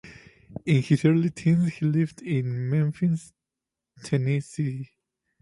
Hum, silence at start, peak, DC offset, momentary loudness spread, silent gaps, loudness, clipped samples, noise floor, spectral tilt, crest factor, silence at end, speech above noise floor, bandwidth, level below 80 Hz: none; 0.05 s; -8 dBFS; under 0.1%; 14 LU; none; -25 LUFS; under 0.1%; -87 dBFS; -8 dB/octave; 18 dB; 0.55 s; 64 dB; 11.5 kHz; -62 dBFS